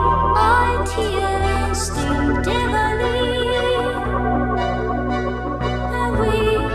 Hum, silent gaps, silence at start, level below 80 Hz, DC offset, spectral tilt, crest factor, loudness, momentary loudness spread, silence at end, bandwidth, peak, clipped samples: none; none; 0 s; -28 dBFS; under 0.1%; -5.5 dB/octave; 14 dB; -19 LUFS; 6 LU; 0 s; 15 kHz; -4 dBFS; under 0.1%